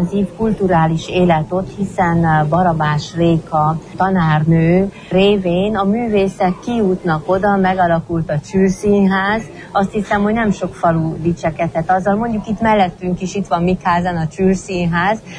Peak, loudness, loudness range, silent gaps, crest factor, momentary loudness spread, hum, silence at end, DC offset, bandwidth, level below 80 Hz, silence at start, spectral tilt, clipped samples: -2 dBFS; -16 LUFS; 2 LU; none; 12 dB; 6 LU; none; 0 s; under 0.1%; 10.5 kHz; -38 dBFS; 0 s; -7 dB/octave; under 0.1%